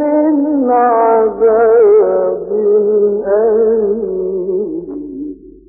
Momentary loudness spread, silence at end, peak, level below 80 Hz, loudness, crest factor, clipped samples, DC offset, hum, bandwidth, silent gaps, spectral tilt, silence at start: 14 LU; 0.2 s; -2 dBFS; -48 dBFS; -12 LUFS; 10 dB; under 0.1%; under 0.1%; none; 2.6 kHz; none; -14.5 dB/octave; 0 s